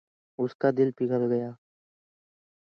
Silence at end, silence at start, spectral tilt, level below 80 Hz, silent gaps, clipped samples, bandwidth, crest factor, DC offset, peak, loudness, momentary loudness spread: 1.15 s; 0.4 s; -10 dB/octave; -78 dBFS; 0.55-0.59 s; under 0.1%; 6 kHz; 20 dB; under 0.1%; -10 dBFS; -27 LUFS; 12 LU